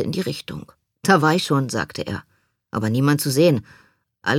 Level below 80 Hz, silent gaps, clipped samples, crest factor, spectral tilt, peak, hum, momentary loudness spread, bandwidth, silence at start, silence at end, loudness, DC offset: -56 dBFS; none; under 0.1%; 20 dB; -5.5 dB/octave; -2 dBFS; none; 14 LU; 17 kHz; 0 s; 0 s; -21 LUFS; under 0.1%